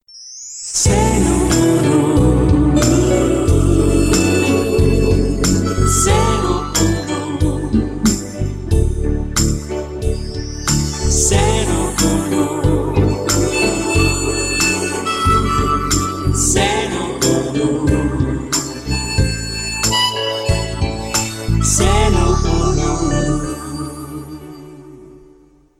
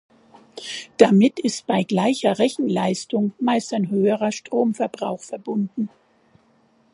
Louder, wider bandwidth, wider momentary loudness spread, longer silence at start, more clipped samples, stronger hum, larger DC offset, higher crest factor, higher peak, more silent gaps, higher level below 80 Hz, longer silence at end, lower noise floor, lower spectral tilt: first, -16 LUFS vs -21 LUFS; first, 16 kHz vs 11.5 kHz; second, 9 LU vs 14 LU; second, 0.15 s vs 0.55 s; neither; neither; neither; second, 14 dB vs 22 dB; about the same, -2 dBFS vs 0 dBFS; neither; first, -22 dBFS vs -68 dBFS; second, 0.6 s vs 1.05 s; second, -48 dBFS vs -59 dBFS; about the same, -4.5 dB/octave vs -5.5 dB/octave